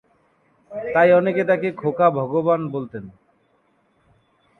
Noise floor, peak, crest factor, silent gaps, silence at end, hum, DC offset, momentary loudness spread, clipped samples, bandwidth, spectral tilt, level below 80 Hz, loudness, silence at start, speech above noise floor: -63 dBFS; -4 dBFS; 18 dB; none; 1.5 s; none; under 0.1%; 18 LU; under 0.1%; 4.3 kHz; -9 dB/octave; -64 dBFS; -19 LUFS; 0.7 s; 44 dB